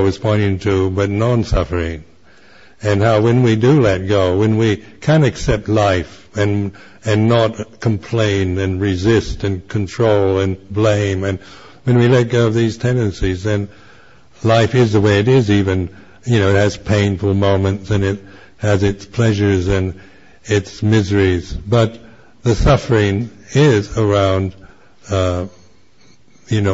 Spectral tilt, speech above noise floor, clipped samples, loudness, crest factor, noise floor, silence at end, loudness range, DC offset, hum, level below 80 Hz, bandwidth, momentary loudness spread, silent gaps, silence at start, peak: -7 dB/octave; 37 dB; under 0.1%; -16 LUFS; 14 dB; -51 dBFS; 0 s; 3 LU; 0.5%; none; -34 dBFS; 8 kHz; 9 LU; none; 0 s; -2 dBFS